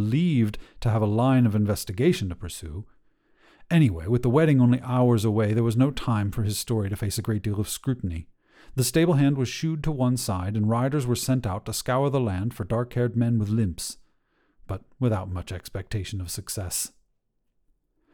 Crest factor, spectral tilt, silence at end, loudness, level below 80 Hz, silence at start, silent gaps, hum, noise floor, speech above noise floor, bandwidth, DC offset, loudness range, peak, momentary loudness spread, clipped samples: 16 dB; -6 dB/octave; 1.25 s; -25 LUFS; -46 dBFS; 0 s; none; none; -72 dBFS; 48 dB; 18.5 kHz; under 0.1%; 9 LU; -8 dBFS; 13 LU; under 0.1%